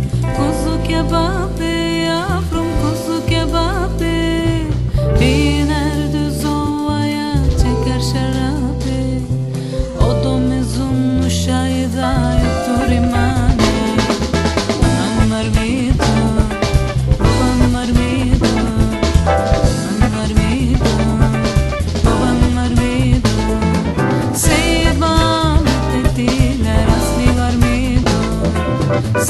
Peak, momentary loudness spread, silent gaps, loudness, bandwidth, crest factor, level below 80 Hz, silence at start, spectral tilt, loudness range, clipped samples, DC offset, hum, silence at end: 0 dBFS; 4 LU; none; -15 LUFS; 13 kHz; 14 dB; -20 dBFS; 0 s; -6 dB/octave; 3 LU; under 0.1%; 0.8%; none; 0 s